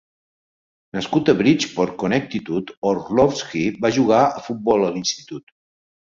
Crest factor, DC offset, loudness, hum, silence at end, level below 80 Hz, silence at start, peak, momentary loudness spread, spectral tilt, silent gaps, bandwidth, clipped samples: 18 dB; under 0.1%; -20 LUFS; none; 0.75 s; -54 dBFS; 0.95 s; -2 dBFS; 11 LU; -5 dB/octave; 2.77-2.82 s; 7.6 kHz; under 0.1%